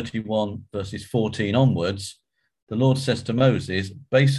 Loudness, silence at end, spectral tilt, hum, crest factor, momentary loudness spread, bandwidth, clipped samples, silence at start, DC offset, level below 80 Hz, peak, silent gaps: -23 LUFS; 0 s; -6.5 dB/octave; none; 18 dB; 12 LU; 12 kHz; under 0.1%; 0 s; under 0.1%; -48 dBFS; -4 dBFS; 2.62-2.67 s